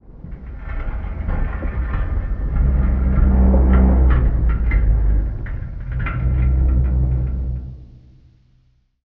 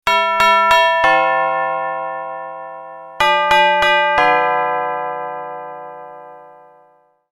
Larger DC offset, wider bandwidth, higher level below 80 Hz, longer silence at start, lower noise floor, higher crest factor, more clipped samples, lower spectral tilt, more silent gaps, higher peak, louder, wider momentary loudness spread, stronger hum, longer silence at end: neither; second, 3.2 kHz vs 16 kHz; first, -18 dBFS vs -52 dBFS; about the same, 0.1 s vs 0.05 s; first, -58 dBFS vs -54 dBFS; about the same, 14 dB vs 16 dB; neither; first, -9.5 dB/octave vs -2.5 dB/octave; neither; second, -4 dBFS vs 0 dBFS; second, -20 LUFS vs -14 LUFS; second, 15 LU vs 20 LU; neither; first, 1.15 s vs 0.85 s